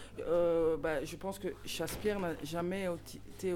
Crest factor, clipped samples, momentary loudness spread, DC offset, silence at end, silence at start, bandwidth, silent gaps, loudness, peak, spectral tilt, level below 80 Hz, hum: 14 dB; under 0.1%; 10 LU; under 0.1%; 0 s; 0 s; 17 kHz; none; -36 LUFS; -22 dBFS; -5 dB/octave; -54 dBFS; none